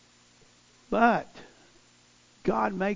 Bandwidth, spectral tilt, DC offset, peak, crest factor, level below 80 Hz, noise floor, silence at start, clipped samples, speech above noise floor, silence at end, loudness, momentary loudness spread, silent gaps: 7.6 kHz; -6.5 dB/octave; under 0.1%; -6 dBFS; 24 dB; -58 dBFS; -60 dBFS; 0.9 s; under 0.1%; 34 dB; 0 s; -27 LUFS; 10 LU; none